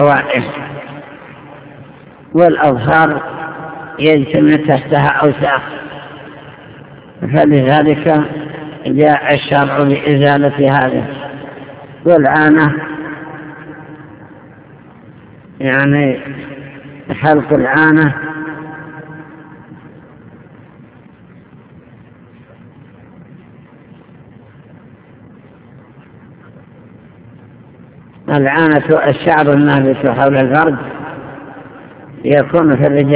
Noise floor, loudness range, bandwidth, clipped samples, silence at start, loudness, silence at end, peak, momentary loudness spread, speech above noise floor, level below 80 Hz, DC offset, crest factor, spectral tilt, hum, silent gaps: -40 dBFS; 7 LU; 4 kHz; 0.4%; 0 s; -12 LUFS; 0 s; 0 dBFS; 23 LU; 30 dB; -48 dBFS; under 0.1%; 14 dB; -11 dB/octave; none; none